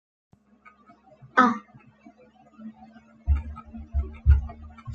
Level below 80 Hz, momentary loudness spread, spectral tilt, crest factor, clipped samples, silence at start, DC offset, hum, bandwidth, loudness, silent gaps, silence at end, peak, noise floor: -32 dBFS; 24 LU; -7.5 dB/octave; 26 dB; under 0.1%; 1.35 s; under 0.1%; none; 6.8 kHz; -25 LUFS; none; 0 s; -2 dBFS; -56 dBFS